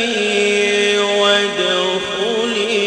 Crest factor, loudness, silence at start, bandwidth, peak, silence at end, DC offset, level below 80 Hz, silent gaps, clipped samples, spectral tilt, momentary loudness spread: 14 dB; -15 LUFS; 0 s; 11 kHz; -2 dBFS; 0 s; under 0.1%; -56 dBFS; none; under 0.1%; -2.5 dB/octave; 5 LU